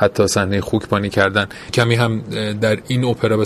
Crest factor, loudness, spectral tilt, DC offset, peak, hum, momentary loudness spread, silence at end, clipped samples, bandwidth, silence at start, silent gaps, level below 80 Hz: 18 dB; -18 LUFS; -5.5 dB/octave; under 0.1%; 0 dBFS; none; 5 LU; 0 s; under 0.1%; 14.5 kHz; 0 s; none; -42 dBFS